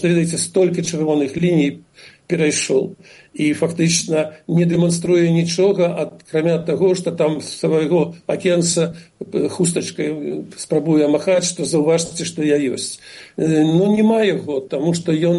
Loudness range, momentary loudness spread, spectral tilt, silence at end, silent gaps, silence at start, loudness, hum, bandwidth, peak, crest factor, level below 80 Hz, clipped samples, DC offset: 2 LU; 9 LU; -5 dB/octave; 0 s; none; 0 s; -18 LUFS; none; 11.5 kHz; -4 dBFS; 14 dB; -58 dBFS; under 0.1%; under 0.1%